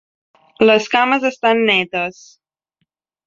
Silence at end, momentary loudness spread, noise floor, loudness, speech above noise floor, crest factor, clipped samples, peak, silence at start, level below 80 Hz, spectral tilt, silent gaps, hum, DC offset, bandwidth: 1.15 s; 9 LU; -72 dBFS; -15 LUFS; 56 dB; 16 dB; under 0.1%; -2 dBFS; 0.6 s; -62 dBFS; -4 dB/octave; none; none; under 0.1%; 7.6 kHz